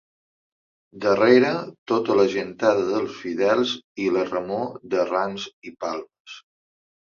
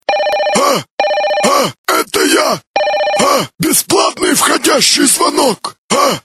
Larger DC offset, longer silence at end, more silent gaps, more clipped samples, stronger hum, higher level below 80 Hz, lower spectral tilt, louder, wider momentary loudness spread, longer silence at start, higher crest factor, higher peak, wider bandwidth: neither; first, 0.65 s vs 0.05 s; about the same, 1.78-1.86 s, 3.84-3.95 s, 5.53-5.62 s, 6.20-6.25 s vs 0.91-0.98 s, 1.78-1.84 s, 2.67-2.74 s, 5.78-5.89 s; neither; neither; second, -66 dBFS vs -52 dBFS; first, -5.5 dB/octave vs -2 dB/octave; second, -22 LUFS vs -11 LUFS; first, 16 LU vs 6 LU; first, 0.95 s vs 0.1 s; first, 20 dB vs 12 dB; second, -4 dBFS vs 0 dBFS; second, 7.2 kHz vs 16.5 kHz